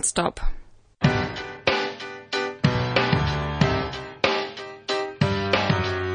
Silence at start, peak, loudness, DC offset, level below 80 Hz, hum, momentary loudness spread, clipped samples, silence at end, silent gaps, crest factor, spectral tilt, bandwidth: 0 s; -6 dBFS; -24 LUFS; under 0.1%; -38 dBFS; none; 9 LU; under 0.1%; 0 s; none; 18 dB; -4.5 dB/octave; 10.5 kHz